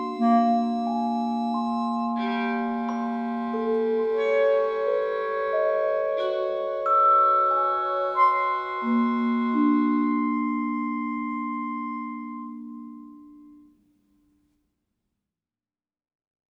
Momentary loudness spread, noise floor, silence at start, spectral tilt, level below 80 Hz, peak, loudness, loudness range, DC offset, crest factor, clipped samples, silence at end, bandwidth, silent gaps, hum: 10 LU; under -90 dBFS; 0 s; -7 dB/octave; -68 dBFS; -10 dBFS; -24 LUFS; 13 LU; under 0.1%; 16 dB; under 0.1%; 3.1 s; 7 kHz; none; none